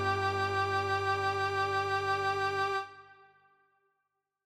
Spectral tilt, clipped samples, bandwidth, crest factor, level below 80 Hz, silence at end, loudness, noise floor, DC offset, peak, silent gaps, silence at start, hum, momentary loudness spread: -4.5 dB/octave; under 0.1%; 15.5 kHz; 14 dB; -70 dBFS; 1.35 s; -31 LUFS; -83 dBFS; under 0.1%; -20 dBFS; none; 0 s; none; 2 LU